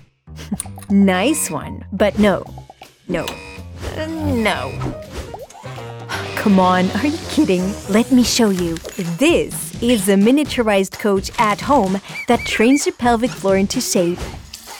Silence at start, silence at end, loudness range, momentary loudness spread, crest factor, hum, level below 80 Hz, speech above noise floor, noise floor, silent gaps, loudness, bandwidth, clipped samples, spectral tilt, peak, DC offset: 0.25 s; 0 s; 7 LU; 17 LU; 14 dB; none; -40 dBFS; 24 dB; -41 dBFS; none; -17 LUFS; 18.5 kHz; under 0.1%; -4.5 dB/octave; -4 dBFS; under 0.1%